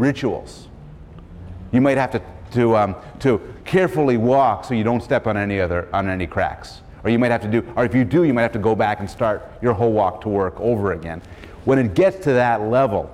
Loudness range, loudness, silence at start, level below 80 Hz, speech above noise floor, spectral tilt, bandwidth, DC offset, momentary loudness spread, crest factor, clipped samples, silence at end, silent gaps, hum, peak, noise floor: 2 LU; -19 LUFS; 0 s; -42 dBFS; 20 dB; -8 dB/octave; 13 kHz; under 0.1%; 12 LU; 14 dB; under 0.1%; 0 s; none; none; -6 dBFS; -39 dBFS